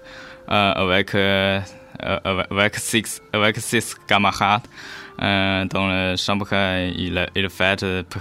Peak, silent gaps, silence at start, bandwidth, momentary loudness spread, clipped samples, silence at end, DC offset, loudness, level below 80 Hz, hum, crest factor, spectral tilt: 0 dBFS; none; 0 s; 16.5 kHz; 8 LU; under 0.1%; 0 s; under 0.1%; -20 LUFS; -50 dBFS; none; 20 dB; -4 dB/octave